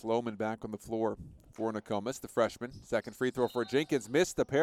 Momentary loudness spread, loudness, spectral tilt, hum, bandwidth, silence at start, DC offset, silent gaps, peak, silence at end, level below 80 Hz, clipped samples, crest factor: 8 LU; -33 LUFS; -5 dB/octave; none; 16 kHz; 0.05 s; under 0.1%; none; -14 dBFS; 0 s; -62 dBFS; under 0.1%; 18 dB